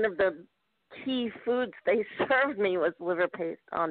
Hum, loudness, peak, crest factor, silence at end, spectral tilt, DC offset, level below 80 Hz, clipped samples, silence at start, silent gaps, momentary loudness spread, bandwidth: none; -29 LUFS; -16 dBFS; 14 dB; 0 s; -2.5 dB/octave; under 0.1%; -68 dBFS; under 0.1%; 0 s; none; 8 LU; 4.6 kHz